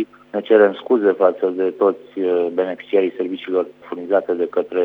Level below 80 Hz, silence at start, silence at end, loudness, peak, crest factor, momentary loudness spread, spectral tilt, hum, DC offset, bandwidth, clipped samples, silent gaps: -74 dBFS; 0 s; 0 s; -19 LUFS; 0 dBFS; 18 dB; 11 LU; -8 dB/octave; 50 Hz at -65 dBFS; under 0.1%; 4.1 kHz; under 0.1%; none